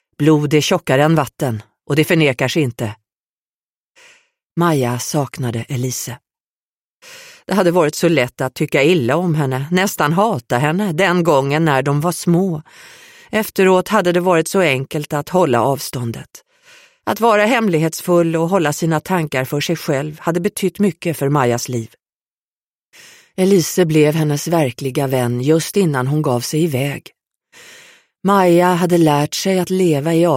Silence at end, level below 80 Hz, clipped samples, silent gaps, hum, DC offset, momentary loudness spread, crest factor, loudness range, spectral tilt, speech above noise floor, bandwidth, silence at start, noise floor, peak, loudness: 0 s; -56 dBFS; under 0.1%; 3.20-3.95 s, 4.45-4.49 s, 6.40-7.00 s, 22.15-22.26 s, 22.34-22.92 s; none; under 0.1%; 9 LU; 14 dB; 5 LU; -5.5 dB/octave; over 74 dB; 16.5 kHz; 0.2 s; under -90 dBFS; -2 dBFS; -16 LUFS